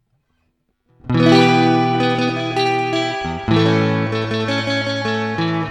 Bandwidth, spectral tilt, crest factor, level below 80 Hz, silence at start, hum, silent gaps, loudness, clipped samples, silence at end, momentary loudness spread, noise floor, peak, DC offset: 11.5 kHz; -6.5 dB/octave; 18 dB; -46 dBFS; 1.05 s; none; none; -17 LUFS; under 0.1%; 0 s; 8 LU; -67 dBFS; 0 dBFS; under 0.1%